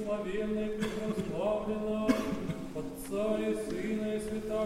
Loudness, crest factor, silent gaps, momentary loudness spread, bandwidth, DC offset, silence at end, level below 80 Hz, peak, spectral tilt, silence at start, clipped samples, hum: -34 LUFS; 20 dB; none; 7 LU; 16 kHz; under 0.1%; 0 s; -52 dBFS; -14 dBFS; -6 dB/octave; 0 s; under 0.1%; none